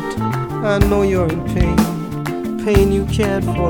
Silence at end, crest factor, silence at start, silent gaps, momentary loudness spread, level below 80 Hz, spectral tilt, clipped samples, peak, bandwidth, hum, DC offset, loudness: 0 s; 16 dB; 0 s; none; 8 LU; -26 dBFS; -7 dB/octave; under 0.1%; 0 dBFS; 18 kHz; none; under 0.1%; -17 LUFS